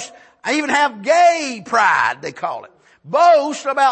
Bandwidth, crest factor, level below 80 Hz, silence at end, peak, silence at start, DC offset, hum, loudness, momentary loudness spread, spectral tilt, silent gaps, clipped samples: 8.8 kHz; 14 dB; -70 dBFS; 0 s; -2 dBFS; 0 s; under 0.1%; none; -16 LUFS; 14 LU; -2.5 dB/octave; none; under 0.1%